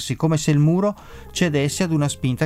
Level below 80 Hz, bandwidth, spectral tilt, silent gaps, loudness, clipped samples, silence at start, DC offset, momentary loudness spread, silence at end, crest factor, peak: -46 dBFS; 14.5 kHz; -6 dB/octave; none; -20 LUFS; under 0.1%; 0 s; under 0.1%; 7 LU; 0 s; 14 dB; -6 dBFS